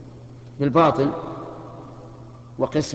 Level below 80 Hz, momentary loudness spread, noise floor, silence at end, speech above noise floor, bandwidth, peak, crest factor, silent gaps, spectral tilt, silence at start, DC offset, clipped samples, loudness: -52 dBFS; 25 LU; -41 dBFS; 0 s; 22 dB; 8.6 kHz; -4 dBFS; 20 dB; none; -6.5 dB/octave; 0 s; under 0.1%; under 0.1%; -21 LUFS